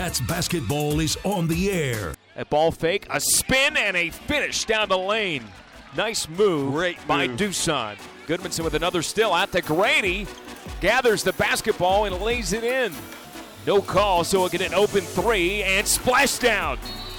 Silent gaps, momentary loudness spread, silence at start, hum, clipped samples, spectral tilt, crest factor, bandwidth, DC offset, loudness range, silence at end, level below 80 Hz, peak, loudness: none; 11 LU; 0 s; none; under 0.1%; -3 dB/octave; 14 dB; 20 kHz; under 0.1%; 3 LU; 0 s; -42 dBFS; -10 dBFS; -22 LUFS